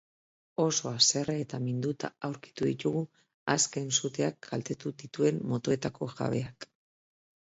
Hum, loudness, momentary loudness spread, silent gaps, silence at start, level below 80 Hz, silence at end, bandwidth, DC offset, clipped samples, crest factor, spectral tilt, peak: none; -31 LUFS; 14 LU; 3.34-3.46 s; 0.6 s; -68 dBFS; 0.9 s; 8 kHz; under 0.1%; under 0.1%; 24 dB; -3.5 dB/octave; -8 dBFS